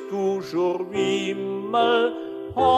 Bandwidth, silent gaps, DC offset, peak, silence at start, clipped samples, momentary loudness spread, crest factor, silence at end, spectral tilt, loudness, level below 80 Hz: 12 kHz; none; under 0.1%; -8 dBFS; 0 s; under 0.1%; 8 LU; 14 dB; 0 s; -5 dB/octave; -24 LUFS; -58 dBFS